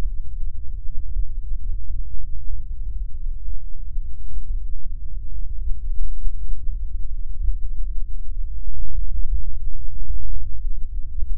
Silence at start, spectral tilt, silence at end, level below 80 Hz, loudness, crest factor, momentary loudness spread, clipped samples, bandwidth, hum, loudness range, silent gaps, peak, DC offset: 0 s; -12.5 dB/octave; 0 s; -24 dBFS; -34 LUFS; 10 dB; 5 LU; under 0.1%; 0.5 kHz; none; 2 LU; none; -2 dBFS; under 0.1%